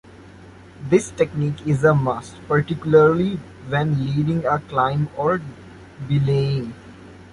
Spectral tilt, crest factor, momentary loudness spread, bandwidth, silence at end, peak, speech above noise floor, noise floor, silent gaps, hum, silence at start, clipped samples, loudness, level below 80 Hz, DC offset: -7.5 dB/octave; 18 dB; 13 LU; 11.5 kHz; 0.1 s; -2 dBFS; 24 dB; -43 dBFS; none; none; 0.15 s; under 0.1%; -20 LUFS; -48 dBFS; under 0.1%